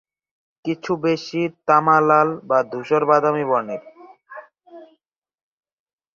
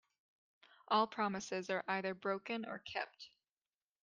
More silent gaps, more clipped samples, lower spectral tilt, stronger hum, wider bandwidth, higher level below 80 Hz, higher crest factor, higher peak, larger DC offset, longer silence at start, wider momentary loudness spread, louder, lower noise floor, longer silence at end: neither; neither; first, -6.5 dB/octave vs -4 dB/octave; neither; second, 7.2 kHz vs 9.4 kHz; first, -68 dBFS vs -84 dBFS; about the same, 20 dB vs 22 dB; first, -2 dBFS vs -20 dBFS; neither; second, 0.65 s vs 0.9 s; first, 18 LU vs 10 LU; first, -19 LUFS vs -39 LUFS; second, -80 dBFS vs under -90 dBFS; first, 1.3 s vs 0.75 s